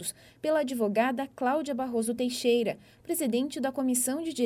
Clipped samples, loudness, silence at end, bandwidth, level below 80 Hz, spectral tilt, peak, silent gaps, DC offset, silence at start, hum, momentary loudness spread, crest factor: under 0.1%; -29 LUFS; 0 s; 17 kHz; -70 dBFS; -3.5 dB/octave; -12 dBFS; none; under 0.1%; 0 s; none; 7 LU; 16 dB